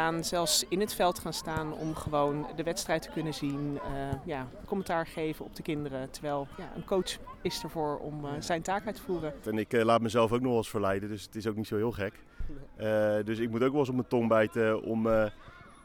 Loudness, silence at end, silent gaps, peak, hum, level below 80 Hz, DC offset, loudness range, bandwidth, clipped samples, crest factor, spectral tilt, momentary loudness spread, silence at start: -31 LUFS; 0 s; none; -12 dBFS; none; -50 dBFS; under 0.1%; 6 LU; 18.5 kHz; under 0.1%; 18 dB; -4.5 dB/octave; 11 LU; 0 s